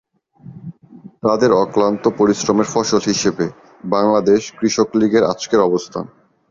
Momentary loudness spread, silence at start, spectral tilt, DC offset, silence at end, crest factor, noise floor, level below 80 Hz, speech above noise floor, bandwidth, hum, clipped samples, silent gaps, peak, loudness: 17 LU; 0.45 s; -5 dB/octave; under 0.1%; 0.45 s; 14 dB; -42 dBFS; -54 dBFS; 26 dB; 7.6 kHz; none; under 0.1%; none; -2 dBFS; -16 LUFS